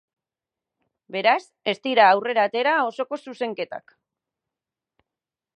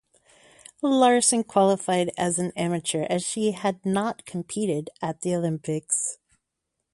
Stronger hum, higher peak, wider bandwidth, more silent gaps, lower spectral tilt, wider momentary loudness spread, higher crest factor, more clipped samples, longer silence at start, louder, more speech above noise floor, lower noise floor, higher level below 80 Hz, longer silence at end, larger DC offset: neither; about the same, -4 dBFS vs -6 dBFS; second, 9.4 kHz vs 11.5 kHz; neither; about the same, -4.5 dB/octave vs -4 dB/octave; first, 15 LU vs 10 LU; about the same, 22 dB vs 18 dB; neither; first, 1.1 s vs 0.85 s; about the same, -22 LUFS vs -24 LUFS; first, 67 dB vs 57 dB; first, -89 dBFS vs -81 dBFS; second, -84 dBFS vs -66 dBFS; first, 1.8 s vs 0.8 s; neither